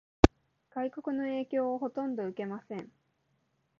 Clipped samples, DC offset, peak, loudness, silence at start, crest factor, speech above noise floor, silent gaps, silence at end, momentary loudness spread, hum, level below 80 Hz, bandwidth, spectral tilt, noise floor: under 0.1%; under 0.1%; 0 dBFS; -32 LUFS; 0.25 s; 32 dB; 41 dB; none; 0.95 s; 16 LU; none; -42 dBFS; 7.2 kHz; -6 dB/octave; -76 dBFS